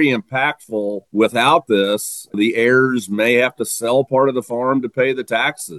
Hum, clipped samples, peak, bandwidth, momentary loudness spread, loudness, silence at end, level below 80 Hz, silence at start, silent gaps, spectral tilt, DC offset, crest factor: none; under 0.1%; -2 dBFS; 13 kHz; 8 LU; -17 LUFS; 0 s; -66 dBFS; 0 s; none; -4 dB/octave; under 0.1%; 16 dB